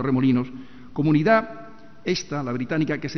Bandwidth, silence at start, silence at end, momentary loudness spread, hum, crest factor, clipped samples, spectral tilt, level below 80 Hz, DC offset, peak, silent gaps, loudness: 6.4 kHz; 0 s; 0 s; 17 LU; none; 16 dB; under 0.1%; -6.5 dB/octave; -54 dBFS; 0.8%; -6 dBFS; none; -23 LUFS